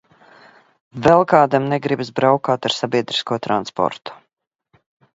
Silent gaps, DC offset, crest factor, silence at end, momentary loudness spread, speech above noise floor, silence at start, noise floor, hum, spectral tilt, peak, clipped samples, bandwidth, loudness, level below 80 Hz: none; under 0.1%; 20 dB; 1 s; 9 LU; 44 dB; 0.95 s; -62 dBFS; none; -5.5 dB/octave; 0 dBFS; under 0.1%; 8 kHz; -18 LUFS; -56 dBFS